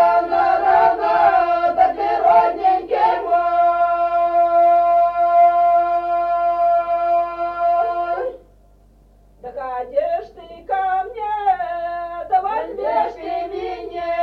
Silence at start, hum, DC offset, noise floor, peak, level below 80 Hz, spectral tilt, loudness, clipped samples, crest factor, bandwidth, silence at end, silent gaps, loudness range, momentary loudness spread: 0 s; 50 Hz at -50 dBFS; under 0.1%; -50 dBFS; -4 dBFS; -50 dBFS; -6 dB/octave; -18 LUFS; under 0.1%; 14 dB; 5.4 kHz; 0 s; none; 8 LU; 12 LU